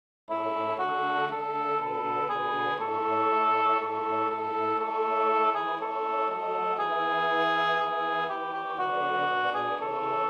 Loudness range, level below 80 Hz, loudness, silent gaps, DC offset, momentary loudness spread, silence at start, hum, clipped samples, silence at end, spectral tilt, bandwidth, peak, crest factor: 1 LU; -78 dBFS; -28 LUFS; none; under 0.1%; 6 LU; 0.3 s; none; under 0.1%; 0 s; -5.5 dB/octave; 7 kHz; -14 dBFS; 14 dB